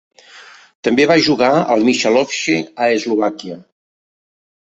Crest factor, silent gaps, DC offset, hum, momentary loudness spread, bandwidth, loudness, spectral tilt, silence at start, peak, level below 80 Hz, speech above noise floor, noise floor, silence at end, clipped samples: 16 dB; 0.75-0.83 s; under 0.1%; none; 11 LU; 8.2 kHz; -15 LUFS; -4 dB/octave; 0.35 s; -2 dBFS; -58 dBFS; 27 dB; -42 dBFS; 1.1 s; under 0.1%